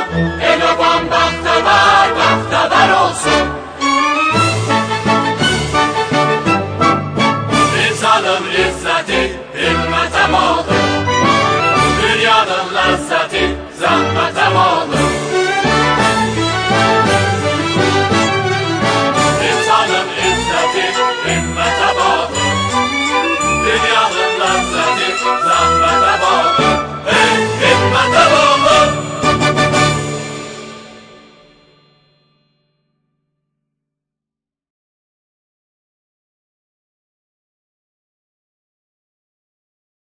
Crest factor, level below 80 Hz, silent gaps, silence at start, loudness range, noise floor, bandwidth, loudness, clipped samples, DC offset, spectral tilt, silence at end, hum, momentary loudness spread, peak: 14 dB; -36 dBFS; none; 0 s; 3 LU; -85 dBFS; 10 kHz; -13 LUFS; under 0.1%; under 0.1%; -4 dB/octave; 9.15 s; none; 5 LU; 0 dBFS